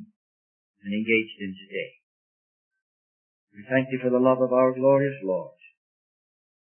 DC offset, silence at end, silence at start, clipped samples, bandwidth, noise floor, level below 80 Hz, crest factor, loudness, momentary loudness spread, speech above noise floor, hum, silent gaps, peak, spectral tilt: under 0.1%; 1.1 s; 0 s; under 0.1%; 3.3 kHz; under -90 dBFS; -76 dBFS; 20 dB; -24 LUFS; 15 LU; over 66 dB; none; 0.16-0.74 s, 2.03-2.71 s, 2.82-3.47 s; -8 dBFS; -10.5 dB/octave